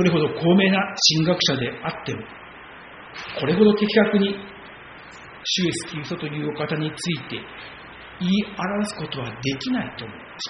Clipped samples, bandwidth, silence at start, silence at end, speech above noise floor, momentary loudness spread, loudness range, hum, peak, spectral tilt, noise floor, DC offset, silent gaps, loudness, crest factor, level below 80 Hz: under 0.1%; 7.4 kHz; 0 s; 0 s; 19 dB; 23 LU; 6 LU; none; -2 dBFS; -4 dB/octave; -42 dBFS; under 0.1%; none; -22 LUFS; 20 dB; -56 dBFS